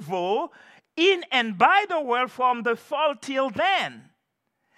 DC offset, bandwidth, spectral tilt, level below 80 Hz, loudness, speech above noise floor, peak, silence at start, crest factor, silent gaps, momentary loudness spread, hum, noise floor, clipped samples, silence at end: under 0.1%; 13.5 kHz; -4 dB/octave; -76 dBFS; -23 LUFS; 53 dB; -4 dBFS; 0 s; 20 dB; none; 8 LU; none; -77 dBFS; under 0.1%; 0.75 s